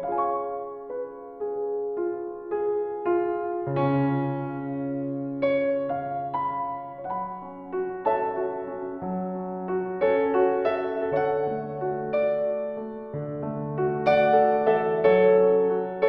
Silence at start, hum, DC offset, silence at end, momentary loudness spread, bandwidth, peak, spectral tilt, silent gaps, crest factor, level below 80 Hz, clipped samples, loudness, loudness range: 0 s; none; under 0.1%; 0 s; 13 LU; 5.6 kHz; -8 dBFS; -9.5 dB/octave; none; 18 dB; -62 dBFS; under 0.1%; -26 LUFS; 7 LU